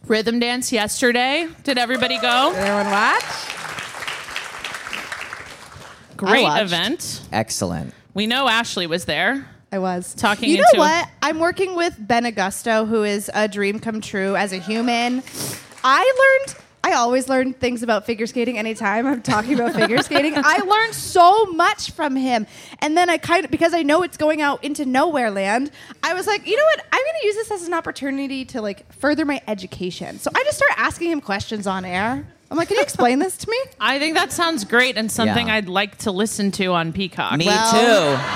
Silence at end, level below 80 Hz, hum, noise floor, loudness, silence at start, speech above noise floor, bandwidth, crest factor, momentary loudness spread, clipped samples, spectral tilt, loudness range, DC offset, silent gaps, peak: 0 s; -54 dBFS; none; -41 dBFS; -19 LUFS; 0.05 s; 22 dB; 16.5 kHz; 20 dB; 13 LU; under 0.1%; -3.5 dB/octave; 5 LU; under 0.1%; none; 0 dBFS